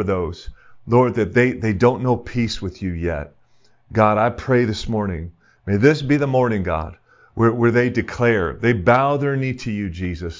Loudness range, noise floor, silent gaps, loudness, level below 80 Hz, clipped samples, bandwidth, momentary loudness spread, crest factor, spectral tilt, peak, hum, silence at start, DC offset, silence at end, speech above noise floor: 3 LU; -59 dBFS; none; -19 LUFS; -38 dBFS; under 0.1%; 7.6 kHz; 11 LU; 18 dB; -7.5 dB/octave; 0 dBFS; none; 0 s; under 0.1%; 0 s; 41 dB